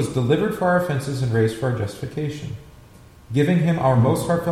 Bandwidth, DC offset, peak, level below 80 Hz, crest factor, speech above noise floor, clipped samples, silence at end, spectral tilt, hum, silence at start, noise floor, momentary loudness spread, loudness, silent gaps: 15 kHz; under 0.1%; -6 dBFS; -48 dBFS; 16 dB; 26 dB; under 0.1%; 0 s; -7 dB/octave; none; 0 s; -46 dBFS; 10 LU; -21 LUFS; none